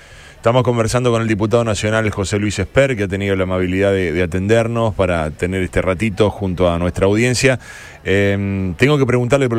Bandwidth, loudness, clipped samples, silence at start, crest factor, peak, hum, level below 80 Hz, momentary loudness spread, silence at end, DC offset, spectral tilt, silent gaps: 14.5 kHz; -16 LUFS; under 0.1%; 0.1 s; 16 dB; 0 dBFS; none; -36 dBFS; 5 LU; 0 s; under 0.1%; -6 dB/octave; none